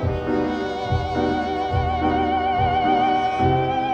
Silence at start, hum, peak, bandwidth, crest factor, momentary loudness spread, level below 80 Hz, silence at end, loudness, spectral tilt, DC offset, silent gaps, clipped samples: 0 s; none; -8 dBFS; 8.2 kHz; 12 dB; 5 LU; -36 dBFS; 0 s; -21 LUFS; -7.5 dB/octave; under 0.1%; none; under 0.1%